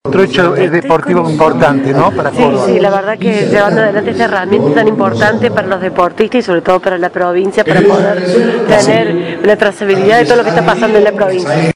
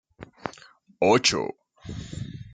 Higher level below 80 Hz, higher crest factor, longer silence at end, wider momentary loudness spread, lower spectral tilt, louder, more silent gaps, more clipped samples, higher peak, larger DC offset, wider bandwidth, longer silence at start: first, -44 dBFS vs -54 dBFS; second, 10 dB vs 22 dB; about the same, 0.05 s vs 0 s; second, 4 LU vs 20 LU; first, -6 dB/octave vs -3.5 dB/octave; first, -10 LUFS vs -23 LUFS; neither; first, 2% vs under 0.1%; first, 0 dBFS vs -6 dBFS; first, 0.2% vs under 0.1%; first, 11 kHz vs 9.4 kHz; second, 0.05 s vs 0.2 s